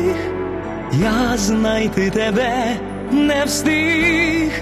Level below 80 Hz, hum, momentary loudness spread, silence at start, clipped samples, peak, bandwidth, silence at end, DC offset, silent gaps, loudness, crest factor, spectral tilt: -36 dBFS; none; 9 LU; 0 s; under 0.1%; -4 dBFS; 13.5 kHz; 0 s; under 0.1%; none; -17 LUFS; 14 dB; -4.5 dB/octave